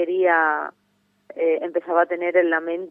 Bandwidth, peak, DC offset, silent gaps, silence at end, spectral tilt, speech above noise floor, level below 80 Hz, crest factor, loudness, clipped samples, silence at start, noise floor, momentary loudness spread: 3.6 kHz; -6 dBFS; under 0.1%; none; 0 s; -6.5 dB/octave; 43 dB; -88 dBFS; 16 dB; -21 LUFS; under 0.1%; 0 s; -64 dBFS; 9 LU